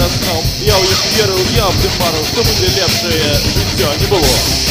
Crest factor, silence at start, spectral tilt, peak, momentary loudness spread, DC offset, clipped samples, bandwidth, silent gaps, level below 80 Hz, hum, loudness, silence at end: 12 dB; 0 s; -3.5 dB/octave; 0 dBFS; 3 LU; under 0.1%; under 0.1%; 16 kHz; none; -24 dBFS; none; -12 LUFS; 0 s